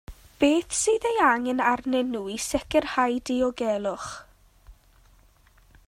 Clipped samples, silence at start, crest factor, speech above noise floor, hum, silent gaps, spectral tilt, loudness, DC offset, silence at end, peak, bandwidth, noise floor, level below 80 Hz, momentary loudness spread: under 0.1%; 0.1 s; 18 dB; 33 dB; none; none; -3 dB/octave; -25 LUFS; under 0.1%; 1.15 s; -8 dBFS; 16 kHz; -58 dBFS; -52 dBFS; 9 LU